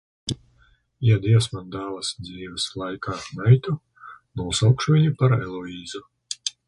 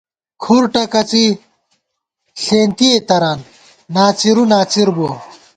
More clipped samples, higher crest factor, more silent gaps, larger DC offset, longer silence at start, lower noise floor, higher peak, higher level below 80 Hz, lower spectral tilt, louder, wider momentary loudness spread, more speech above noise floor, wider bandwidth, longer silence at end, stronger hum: neither; first, 20 dB vs 14 dB; neither; neither; second, 0.25 s vs 0.4 s; second, -60 dBFS vs -73 dBFS; second, -4 dBFS vs 0 dBFS; first, -50 dBFS vs -56 dBFS; about the same, -5.5 dB/octave vs -4.5 dB/octave; second, -23 LUFS vs -13 LUFS; first, 16 LU vs 13 LU; second, 38 dB vs 60 dB; first, 11.5 kHz vs 9.4 kHz; about the same, 0.2 s vs 0.25 s; neither